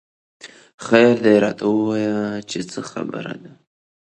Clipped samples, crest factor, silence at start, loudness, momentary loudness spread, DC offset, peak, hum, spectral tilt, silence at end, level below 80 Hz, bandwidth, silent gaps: under 0.1%; 20 dB; 0.45 s; -19 LUFS; 17 LU; under 0.1%; 0 dBFS; none; -5.5 dB/octave; 0.7 s; -62 dBFS; 9.6 kHz; 0.74-0.78 s